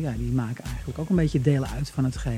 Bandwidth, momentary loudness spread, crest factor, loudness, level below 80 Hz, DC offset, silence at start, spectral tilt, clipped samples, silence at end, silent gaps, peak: 14.5 kHz; 11 LU; 16 dB; -26 LUFS; -36 dBFS; under 0.1%; 0 s; -7.5 dB/octave; under 0.1%; 0 s; none; -8 dBFS